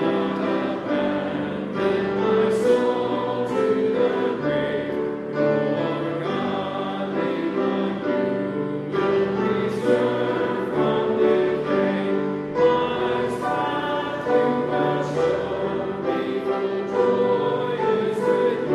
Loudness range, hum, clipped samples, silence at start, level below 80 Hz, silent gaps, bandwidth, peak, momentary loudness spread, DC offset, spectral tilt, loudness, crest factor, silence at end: 3 LU; none; under 0.1%; 0 s; -58 dBFS; none; 12 kHz; -8 dBFS; 6 LU; under 0.1%; -7 dB/octave; -23 LUFS; 14 dB; 0 s